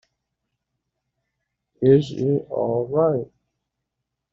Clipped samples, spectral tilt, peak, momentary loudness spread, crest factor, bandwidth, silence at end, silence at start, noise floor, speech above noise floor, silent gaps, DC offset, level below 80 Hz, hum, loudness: under 0.1%; -8.5 dB/octave; -4 dBFS; 8 LU; 20 dB; 7.4 kHz; 1.05 s; 1.8 s; -81 dBFS; 62 dB; none; under 0.1%; -60 dBFS; none; -21 LUFS